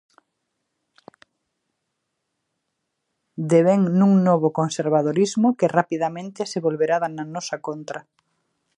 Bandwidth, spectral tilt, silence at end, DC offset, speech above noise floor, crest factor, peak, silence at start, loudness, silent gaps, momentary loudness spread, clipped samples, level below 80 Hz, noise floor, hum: 10.5 kHz; -6.5 dB/octave; 0.75 s; under 0.1%; 58 dB; 20 dB; -2 dBFS; 3.4 s; -21 LUFS; none; 14 LU; under 0.1%; -74 dBFS; -78 dBFS; none